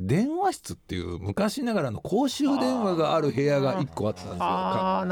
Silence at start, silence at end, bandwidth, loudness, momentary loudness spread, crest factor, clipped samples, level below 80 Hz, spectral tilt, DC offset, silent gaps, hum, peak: 0 s; 0 s; 18.5 kHz; -26 LUFS; 8 LU; 12 dB; under 0.1%; -56 dBFS; -6 dB/octave; under 0.1%; none; none; -14 dBFS